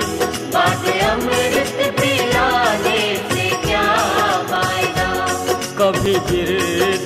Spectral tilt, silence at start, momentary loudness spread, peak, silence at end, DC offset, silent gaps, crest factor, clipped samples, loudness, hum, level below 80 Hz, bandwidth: -3.5 dB/octave; 0 s; 3 LU; -4 dBFS; 0 s; under 0.1%; none; 14 dB; under 0.1%; -17 LUFS; none; -38 dBFS; 16 kHz